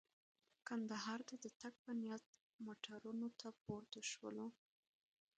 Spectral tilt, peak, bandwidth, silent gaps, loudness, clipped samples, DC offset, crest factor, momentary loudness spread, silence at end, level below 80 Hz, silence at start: -3.5 dB/octave; -34 dBFS; 9 kHz; 1.56-1.60 s, 1.79-1.85 s, 2.26-2.33 s, 2.41-2.59 s, 3.61-3.65 s; -50 LUFS; under 0.1%; under 0.1%; 18 dB; 9 LU; 0.85 s; -88 dBFS; 0.65 s